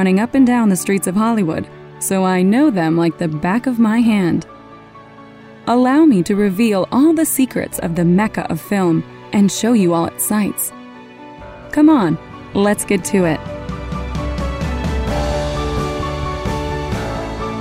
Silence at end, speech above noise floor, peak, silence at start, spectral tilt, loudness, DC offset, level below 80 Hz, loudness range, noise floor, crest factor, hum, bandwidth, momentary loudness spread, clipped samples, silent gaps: 0 s; 24 dB; -2 dBFS; 0 s; -5.5 dB/octave; -16 LUFS; under 0.1%; -32 dBFS; 6 LU; -39 dBFS; 14 dB; none; 16 kHz; 11 LU; under 0.1%; none